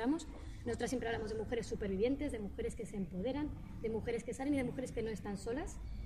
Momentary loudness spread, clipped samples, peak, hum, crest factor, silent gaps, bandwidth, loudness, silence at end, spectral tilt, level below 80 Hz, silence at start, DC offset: 7 LU; under 0.1%; -24 dBFS; none; 16 dB; none; 14.5 kHz; -40 LUFS; 0 s; -6 dB/octave; -50 dBFS; 0 s; under 0.1%